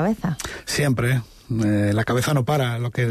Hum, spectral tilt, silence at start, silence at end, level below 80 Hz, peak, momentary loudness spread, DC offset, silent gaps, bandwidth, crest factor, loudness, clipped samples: none; -6 dB/octave; 0 s; 0 s; -46 dBFS; -10 dBFS; 6 LU; under 0.1%; none; 13.5 kHz; 12 dB; -22 LUFS; under 0.1%